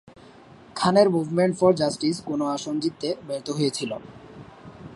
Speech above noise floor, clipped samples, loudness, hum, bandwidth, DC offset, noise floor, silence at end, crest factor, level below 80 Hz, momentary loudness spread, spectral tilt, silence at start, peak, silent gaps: 25 dB; under 0.1%; -24 LUFS; none; 11.5 kHz; under 0.1%; -48 dBFS; 0 s; 20 dB; -62 dBFS; 25 LU; -5.5 dB/octave; 0.75 s; -4 dBFS; none